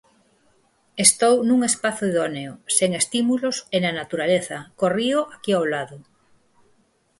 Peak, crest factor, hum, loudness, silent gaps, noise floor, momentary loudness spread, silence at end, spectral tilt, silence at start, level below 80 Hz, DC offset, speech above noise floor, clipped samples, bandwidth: 0 dBFS; 22 dB; none; -21 LUFS; none; -63 dBFS; 11 LU; 1.2 s; -3 dB/octave; 0.95 s; -66 dBFS; under 0.1%; 42 dB; under 0.1%; 11.5 kHz